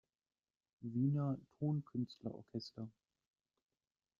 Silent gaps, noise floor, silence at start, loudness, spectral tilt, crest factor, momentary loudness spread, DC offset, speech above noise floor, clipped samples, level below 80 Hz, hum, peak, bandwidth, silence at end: none; under -90 dBFS; 0.8 s; -42 LUFS; -9.5 dB/octave; 18 dB; 15 LU; under 0.1%; over 49 dB; under 0.1%; -78 dBFS; none; -26 dBFS; 7.2 kHz; 1.3 s